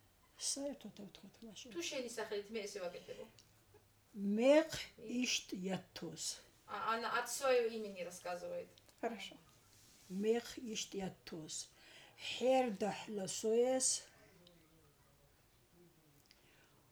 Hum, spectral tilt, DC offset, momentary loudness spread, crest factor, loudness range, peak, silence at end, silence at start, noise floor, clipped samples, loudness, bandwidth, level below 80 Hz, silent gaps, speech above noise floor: none; -3 dB/octave; under 0.1%; 19 LU; 22 dB; 7 LU; -20 dBFS; 2.85 s; 0.4 s; -70 dBFS; under 0.1%; -39 LUFS; over 20 kHz; -76 dBFS; none; 30 dB